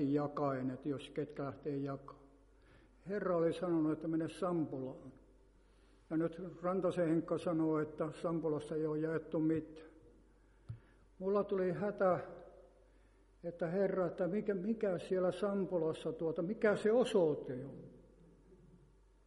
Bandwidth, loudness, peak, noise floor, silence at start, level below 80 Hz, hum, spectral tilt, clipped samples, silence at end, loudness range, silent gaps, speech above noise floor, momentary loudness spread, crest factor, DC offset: 11.5 kHz; -37 LUFS; -20 dBFS; -66 dBFS; 0 s; -68 dBFS; none; -8 dB/octave; under 0.1%; 0.7 s; 4 LU; none; 30 dB; 15 LU; 18 dB; under 0.1%